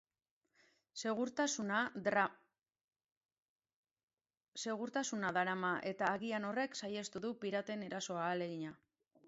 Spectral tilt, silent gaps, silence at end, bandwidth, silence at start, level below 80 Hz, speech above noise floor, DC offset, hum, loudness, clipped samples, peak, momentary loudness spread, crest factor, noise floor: -3 dB/octave; 2.84-2.88 s, 3.12-3.29 s, 3.38-3.59 s, 3.76-3.83 s, 4.03-4.17 s, 4.48-4.52 s; 0.5 s; 7.6 kHz; 0.95 s; -84 dBFS; over 51 dB; under 0.1%; none; -39 LUFS; under 0.1%; -20 dBFS; 8 LU; 22 dB; under -90 dBFS